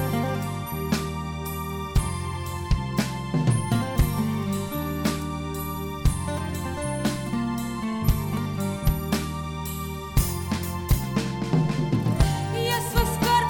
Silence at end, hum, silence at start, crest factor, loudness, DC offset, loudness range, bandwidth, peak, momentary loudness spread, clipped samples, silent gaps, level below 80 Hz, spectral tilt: 0 s; none; 0 s; 16 dB; -27 LUFS; under 0.1%; 3 LU; 17.5 kHz; -10 dBFS; 7 LU; under 0.1%; none; -32 dBFS; -5.5 dB/octave